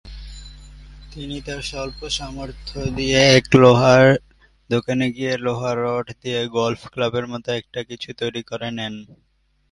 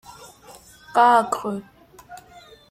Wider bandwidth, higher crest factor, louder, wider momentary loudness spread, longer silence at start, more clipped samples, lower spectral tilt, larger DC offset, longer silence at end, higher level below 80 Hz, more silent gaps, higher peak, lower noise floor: second, 11.5 kHz vs 16 kHz; about the same, 20 dB vs 20 dB; about the same, -19 LUFS vs -19 LUFS; second, 19 LU vs 26 LU; about the same, 0.05 s vs 0.1 s; neither; about the same, -5 dB/octave vs -4 dB/octave; neither; first, 0.7 s vs 0.55 s; first, -42 dBFS vs -62 dBFS; neither; first, 0 dBFS vs -4 dBFS; second, -40 dBFS vs -48 dBFS